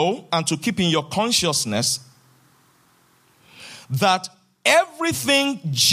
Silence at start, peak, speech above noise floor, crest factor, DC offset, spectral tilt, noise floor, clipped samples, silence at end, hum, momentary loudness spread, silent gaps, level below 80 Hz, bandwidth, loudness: 0 s; -4 dBFS; 38 dB; 20 dB; under 0.1%; -3 dB/octave; -58 dBFS; under 0.1%; 0 s; none; 10 LU; none; -60 dBFS; 15.5 kHz; -20 LUFS